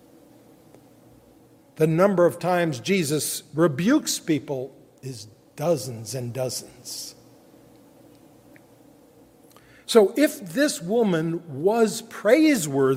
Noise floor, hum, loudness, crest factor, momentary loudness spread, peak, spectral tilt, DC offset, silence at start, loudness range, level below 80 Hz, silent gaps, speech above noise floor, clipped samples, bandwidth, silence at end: -54 dBFS; none; -23 LUFS; 22 dB; 18 LU; -2 dBFS; -5 dB/octave; under 0.1%; 1.8 s; 13 LU; -68 dBFS; none; 32 dB; under 0.1%; 16 kHz; 0 s